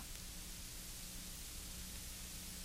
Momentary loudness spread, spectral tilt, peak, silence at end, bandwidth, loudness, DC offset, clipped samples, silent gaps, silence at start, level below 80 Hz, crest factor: 1 LU; -2 dB/octave; -32 dBFS; 0 s; 16 kHz; -48 LUFS; under 0.1%; under 0.1%; none; 0 s; -54 dBFS; 18 dB